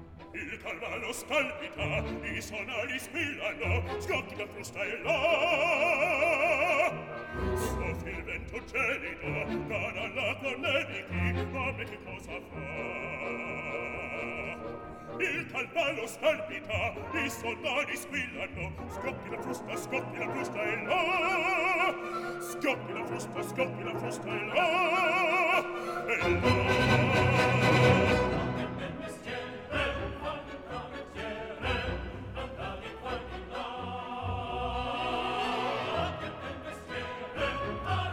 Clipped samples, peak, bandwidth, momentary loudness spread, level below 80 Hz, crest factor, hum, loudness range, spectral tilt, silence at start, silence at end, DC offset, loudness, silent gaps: under 0.1%; -10 dBFS; 19 kHz; 13 LU; -50 dBFS; 22 dB; none; 10 LU; -5 dB/octave; 0 s; 0 s; under 0.1%; -31 LUFS; none